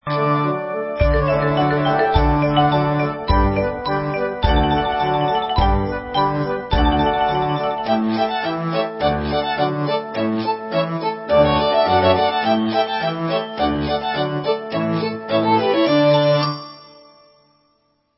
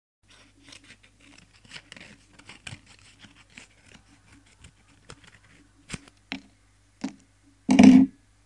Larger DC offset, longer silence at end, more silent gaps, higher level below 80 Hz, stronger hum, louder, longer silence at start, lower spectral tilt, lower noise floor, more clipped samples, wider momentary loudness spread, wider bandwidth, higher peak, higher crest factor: neither; first, 1.35 s vs 0.4 s; neither; first, -30 dBFS vs -58 dBFS; neither; about the same, -19 LUFS vs -17 LUFS; second, 0.05 s vs 6.3 s; first, -10.5 dB/octave vs -6 dB/octave; about the same, -64 dBFS vs -61 dBFS; neither; second, 7 LU vs 31 LU; second, 5.8 kHz vs 11 kHz; about the same, 0 dBFS vs -2 dBFS; second, 18 dB vs 26 dB